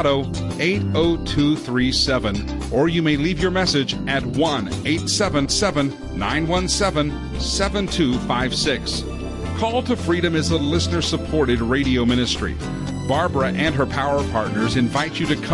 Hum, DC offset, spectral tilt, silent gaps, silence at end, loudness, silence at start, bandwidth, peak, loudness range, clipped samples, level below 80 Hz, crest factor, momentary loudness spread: none; under 0.1%; -4.5 dB/octave; none; 0 s; -20 LUFS; 0 s; 11.5 kHz; -6 dBFS; 2 LU; under 0.1%; -34 dBFS; 14 dB; 6 LU